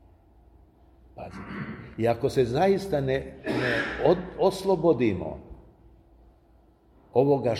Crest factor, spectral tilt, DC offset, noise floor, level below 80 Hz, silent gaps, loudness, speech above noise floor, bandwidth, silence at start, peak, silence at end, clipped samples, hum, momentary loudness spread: 20 dB; -7 dB/octave; under 0.1%; -59 dBFS; -50 dBFS; none; -26 LUFS; 34 dB; 14 kHz; 1.15 s; -8 dBFS; 0 s; under 0.1%; none; 15 LU